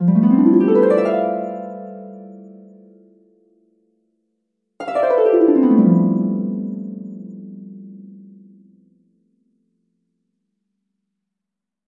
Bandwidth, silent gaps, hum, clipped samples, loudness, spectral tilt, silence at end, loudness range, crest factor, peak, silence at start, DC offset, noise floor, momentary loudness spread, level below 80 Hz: 5.6 kHz; none; none; under 0.1%; -16 LUFS; -10.5 dB/octave; 3.8 s; 20 LU; 18 dB; -2 dBFS; 0 s; under 0.1%; -84 dBFS; 24 LU; -74 dBFS